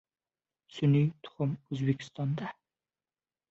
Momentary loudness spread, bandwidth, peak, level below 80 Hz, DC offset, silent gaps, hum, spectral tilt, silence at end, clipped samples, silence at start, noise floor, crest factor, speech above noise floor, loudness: 11 LU; 7.8 kHz; -16 dBFS; -70 dBFS; under 0.1%; none; none; -8.5 dB/octave; 1 s; under 0.1%; 0.75 s; under -90 dBFS; 18 dB; over 60 dB; -31 LUFS